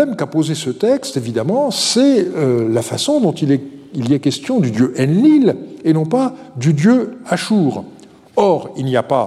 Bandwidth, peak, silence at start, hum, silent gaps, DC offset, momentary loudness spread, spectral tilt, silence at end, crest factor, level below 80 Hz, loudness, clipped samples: 13.5 kHz; -2 dBFS; 0 s; none; none; under 0.1%; 8 LU; -6 dB/octave; 0 s; 14 dB; -62 dBFS; -16 LUFS; under 0.1%